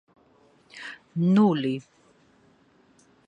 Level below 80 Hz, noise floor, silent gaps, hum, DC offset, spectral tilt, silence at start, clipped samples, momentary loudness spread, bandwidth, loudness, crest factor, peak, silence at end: -74 dBFS; -61 dBFS; none; none; under 0.1%; -8 dB/octave; 0.75 s; under 0.1%; 21 LU; 8.6 kHz; -24 LUFS; 20 dB; -8 dBFS; 1.45 s